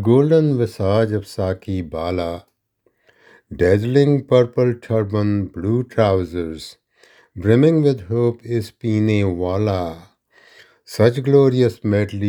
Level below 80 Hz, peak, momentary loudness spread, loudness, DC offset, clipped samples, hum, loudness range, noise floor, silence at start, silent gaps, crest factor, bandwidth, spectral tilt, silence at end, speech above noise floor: -52 dBFS; 0 dBFS; 12 LU; -18 LUFS; under 0.1%; under 0.1%; none; 3 LU; -65 dBFS; 0 s; none; 18 dB; 16 kHz; -8 dB/octave; 0 s; 48 dB